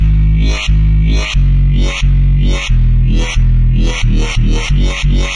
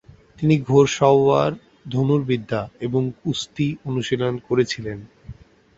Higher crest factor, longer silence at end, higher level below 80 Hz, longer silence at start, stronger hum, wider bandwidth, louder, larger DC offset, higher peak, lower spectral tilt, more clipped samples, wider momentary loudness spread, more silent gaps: second, 8 dB vs 18 dB; second, 0 s vs 0.45 s; first, -10 dBFS vs -52 dBFS; second, 0 s vs 0.4 s; neither; first, 9.4 kHz vs 8 kHz; first, -13 LUFS vs -21 LUFS; neither; about the same, -2 dBFS vs -2 dBFS; about the same, -5.5 dB/octave vs -6.5 dB/octave; neither; second, 2 LU vs 12 LU; neither